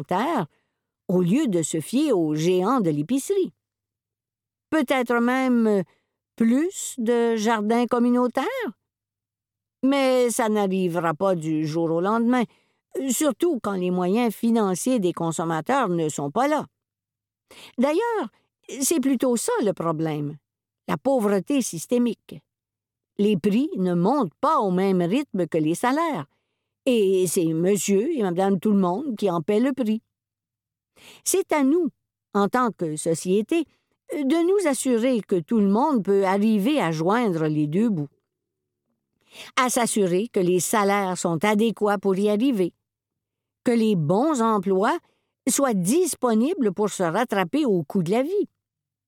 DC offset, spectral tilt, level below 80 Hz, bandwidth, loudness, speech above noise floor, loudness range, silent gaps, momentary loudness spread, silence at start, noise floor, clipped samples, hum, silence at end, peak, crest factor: under 0.1%; -5.5 dB/octave; -72 dBFS; 18 kHz; -23 LUFS; 68 dB; 3 LU; none; 7 LU; 0 s; -90 dBFS; under 0.1%; none; 0.6 s; -4 dBFS; 20 dB